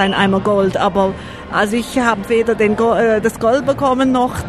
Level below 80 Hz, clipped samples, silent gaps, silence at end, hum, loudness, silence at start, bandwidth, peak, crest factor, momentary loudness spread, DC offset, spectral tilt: -40 dBFS; under 0.1%; none; 0 s; none; -15 LUFS; 0 s; 14 kHz; -2 dBFS; 14 dB; 4 LU; under 0.1%; -5.5 dB/octave